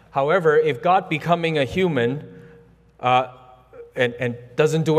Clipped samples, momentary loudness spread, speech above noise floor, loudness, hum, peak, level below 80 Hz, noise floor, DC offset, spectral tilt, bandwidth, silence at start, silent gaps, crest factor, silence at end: under 0.1%; 9 LU; 30 dB; -21 LUFS; none; -4 dBFS; -56 dBFS; -50 dBFS; under 0.1%; -6 dB/octave; 14 kHz; 0.15 s; none; 18 dB; 0 s